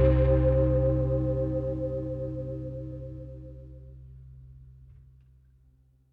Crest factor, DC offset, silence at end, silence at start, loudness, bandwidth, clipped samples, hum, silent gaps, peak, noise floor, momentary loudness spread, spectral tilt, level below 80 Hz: 18 dB; under 0.1%; 1.25 s; 0 s; -28 LUFS; 3.9 kHz; under 0.1%; none; none; -10 dBFS; -62 dBFS; 25 LU; -11.5 dB/octave; -34 dBFS